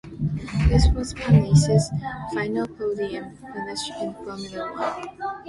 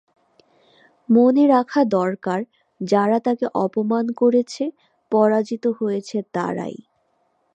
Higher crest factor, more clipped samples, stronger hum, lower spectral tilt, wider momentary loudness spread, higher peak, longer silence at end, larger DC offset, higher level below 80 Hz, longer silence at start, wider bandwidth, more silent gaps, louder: about the same, 20 dB vs 16 dB; neither; neither; about the same, -6.5 dB/octave vs -7 dB/octave; about the same, 14 LU vs 12 LU; about the same, -4 dBFS vs -4 dBFS; second, 0 s vs 0.8 s; neither; first, -30 dBFS vs -72 dBFS; second, 0.05 s vs 1.1 s; first, 11.5 kHz vs 8.8 kHz; neither; second, -23 LUFS vs -20 LUFS